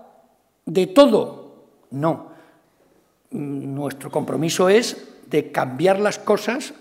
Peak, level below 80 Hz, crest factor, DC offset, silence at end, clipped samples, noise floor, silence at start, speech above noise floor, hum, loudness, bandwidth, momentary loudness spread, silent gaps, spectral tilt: 0 dBFS; -66 dBFS; 22 dB; under 0.1%; 0.05 s; under 0.1%; -60 dBFS; 0.65 s; 40 dB; none; -20 LUFS; 16 kHz; 16 LU; none; -5 dB/octave